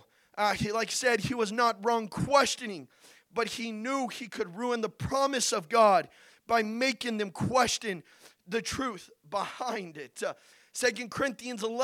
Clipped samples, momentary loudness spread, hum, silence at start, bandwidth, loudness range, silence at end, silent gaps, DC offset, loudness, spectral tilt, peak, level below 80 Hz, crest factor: under 0.1%; 12 LU; none; 0.35 s; 17 kHz; 6 LU; 0 s; none; under 0.1%; -30 LUFS; -3.5 dB/octave; -10 dBFS; -60 dBFS; 20 dB